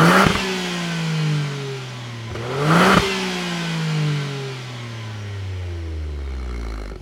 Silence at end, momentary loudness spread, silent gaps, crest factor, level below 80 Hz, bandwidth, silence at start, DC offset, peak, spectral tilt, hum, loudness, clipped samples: 0 s; 16 LU; none; 20 dB; -36 dBFS; 16.5 kHz; 0 s; under 0.1%; 0 dBFS; -5 dB/octave; none; -22 LUFS; under 0.1%